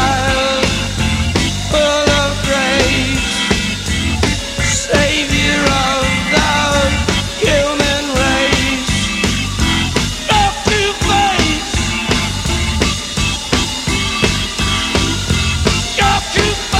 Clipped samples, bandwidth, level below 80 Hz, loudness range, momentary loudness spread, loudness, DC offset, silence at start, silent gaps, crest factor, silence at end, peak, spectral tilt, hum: under 0.1%; 16 kHz; -24 dBFS; 2 LU; 4 LU; -14 LUFS; under 0.1%; 0 s; none; 14 dB; 0 s; 0 dBFS; -3.5 dB/octave; none